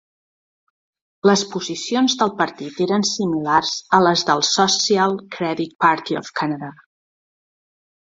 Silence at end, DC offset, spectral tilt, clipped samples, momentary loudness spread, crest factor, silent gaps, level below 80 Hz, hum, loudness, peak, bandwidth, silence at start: 1.45 s; under 0.1%; -3.5 dB/octave; under 0.1%; 9 LU; 20 dB; none; -64 dBFS; none; -19 LUFS; -2 dBFS; 7.8 kHz; 1.25 s